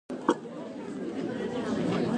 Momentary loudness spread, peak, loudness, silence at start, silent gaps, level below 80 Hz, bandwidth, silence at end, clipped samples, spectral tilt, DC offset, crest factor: 9 LU; -10 dBFS; -32 LUFS; 0.1 s; none; -62 dBFS; 10.5 kHz; 0 s; under 0.1%; -6.5 dB/octave; under 0.1%; 22 dB